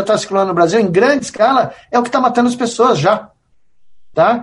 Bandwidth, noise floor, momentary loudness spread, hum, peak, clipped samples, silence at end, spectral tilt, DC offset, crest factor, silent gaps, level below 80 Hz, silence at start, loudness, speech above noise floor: 11.5 kHz; -51 dBFS; 5 LU; none; 0 dBFS; under 0.1%; 0 s; -5 dB/octave; under 0.1%; 14 dB; none; -54 dBFS; 0 s; -14 LUFS; 38 dB